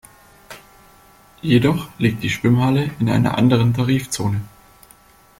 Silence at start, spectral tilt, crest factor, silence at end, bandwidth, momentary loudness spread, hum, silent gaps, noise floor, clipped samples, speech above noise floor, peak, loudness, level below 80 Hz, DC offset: 0.5 s; -6.5 dB/octave; 16 dB; 0.9 s; 16 kHz; 17 LU; none; none; -50 dBFS; under 0.1%; 33 dB; -2 dBFS; -18 LUFS; -48 dBFS; under 0.1%